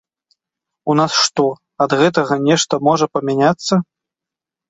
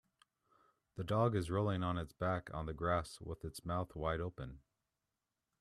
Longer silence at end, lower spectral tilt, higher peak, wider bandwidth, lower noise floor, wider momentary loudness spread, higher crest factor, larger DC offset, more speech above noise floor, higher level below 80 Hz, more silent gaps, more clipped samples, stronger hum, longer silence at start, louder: second, 0.85 s vs 1.05 s; second, -4.5 dB/octave vs -7 dB/octave; first, -2 dBFS vs -20 dBFS; second, 8.2 kHz vs 13 kHz; second, -86 dBFS vs -90 dBFS; second, 6 LU vs 13 LU; about the same, 16 dB vs 20 dB; neither; first, 71 dB vs 51 dB; about the same, -58 dBFS vs -58 dBFS; neither; neither; neither; about the same, 0.85 s vs 0.95 s; first, -16 LUFS vs -39 LUFS